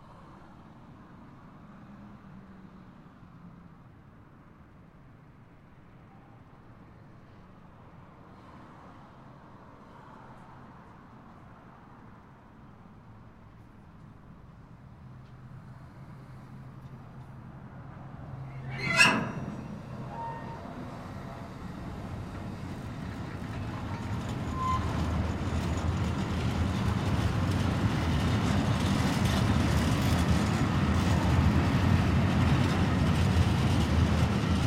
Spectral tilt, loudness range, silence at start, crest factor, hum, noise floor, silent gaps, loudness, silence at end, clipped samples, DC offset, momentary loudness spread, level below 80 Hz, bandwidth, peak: -6 dB/octave; 25 LU; 0 s; 24 dB; none; -53 dBFS; none; -29 LUFS; 0 s; under 0.1%; under 0.1%; 26 LU; -40 dBFS; 15.5 kHz; -8 dBFS